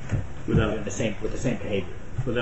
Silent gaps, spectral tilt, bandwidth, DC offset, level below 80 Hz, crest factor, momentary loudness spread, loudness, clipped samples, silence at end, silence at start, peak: none; -6 dB/octave; 8.2 kHz; 2%; -36 dBFS; 16 dB; 7 LU; -28 LUFS; under 0.1%; 0 s; 0 s; -10 dBFS